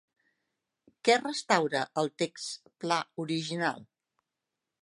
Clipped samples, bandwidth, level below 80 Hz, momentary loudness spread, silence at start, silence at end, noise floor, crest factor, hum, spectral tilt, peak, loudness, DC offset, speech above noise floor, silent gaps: under 0.1%; 11.5 kHz; -82 dBFS; 12 LU; 1.05 s; 1 s; -87 dBFS; 24 dB; none; -3.5 dB/octave; -8 dBFS; -30 LUFS; under 0.1%; 57 dB; none